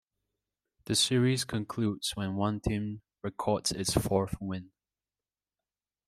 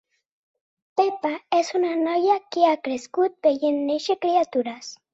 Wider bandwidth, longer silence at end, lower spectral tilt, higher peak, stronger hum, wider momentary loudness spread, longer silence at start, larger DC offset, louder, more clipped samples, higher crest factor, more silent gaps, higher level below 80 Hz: first, 16 kHz vs 8 kHz; first, 1.4 s vs 0.2 s; about the same, -4.5 dB/octave vs -3.5 dB/octave; second, -12 dBFS vs -6 dBFS; neither; first, 13 LU vs 7 LU; about the same, 0.9 s vs 0.95 s; neither; second, -31 LUFS vs -23 LUFS; neither; about the same, 20 dB vs 18 dB; neither; first, -52 dBFS vs -72 dBFS